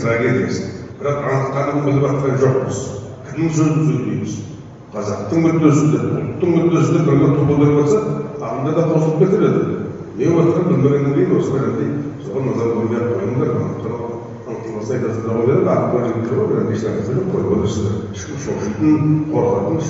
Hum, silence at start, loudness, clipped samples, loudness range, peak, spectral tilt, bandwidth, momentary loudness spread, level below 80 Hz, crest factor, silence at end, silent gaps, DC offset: none; 0 s; -17 LUFS; under 0.1%; 5 LU; 0 dBFS; -8.5 dB/octave; 8 kHz; 12 LU; -48 dBFS; 16 dB; 0 s; none; under 0.1%